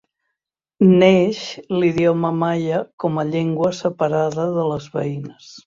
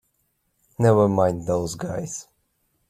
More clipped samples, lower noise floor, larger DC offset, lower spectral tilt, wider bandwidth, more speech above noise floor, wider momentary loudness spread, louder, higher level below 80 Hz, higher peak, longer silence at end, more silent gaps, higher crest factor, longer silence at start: neither; first, -82 dBFS vs -71 dBFS; neither; about the same, -7 dB/octave vs -7 dB/octave; second, 7.6 kHz vs 14.5 kHz; first, 64 dB vs 50 dB; second, 12 LU vs 16 LU; first, -19 LUFS vs -22 LUFS; about the same, -56 dBFS vs -54 dBFS; about the same, -2 dBFS vs -4 dBFS; second, 0.1 s vs 0.65 s; first, 2.93-2.98 s vs none; about the same, 18 dB vs 20 dB; about the same, 0.8 s vs 0.8 s